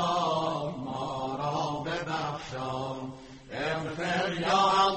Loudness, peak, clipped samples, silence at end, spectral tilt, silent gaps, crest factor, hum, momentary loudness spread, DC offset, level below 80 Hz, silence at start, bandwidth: -30 LUFS; -12 dBFS; under 0.1%; 0 s; -4.5 dB/octave; none; 18 dB; none; 11 LU; under 0.1%; -58 dBFS; 0 s; 8.4 kHz